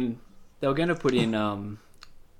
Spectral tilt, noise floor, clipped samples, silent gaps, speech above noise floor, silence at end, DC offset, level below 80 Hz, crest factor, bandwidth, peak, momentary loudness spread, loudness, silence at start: -6.5 dB/octave; -48 dBFS; under 0.1%; none; 22 dB; 0.2 s; under 0.1%; -52 dBFS; 16 dB; 15 kHz; -12 dBFS; 17 LU; -27 LUFS; 0 s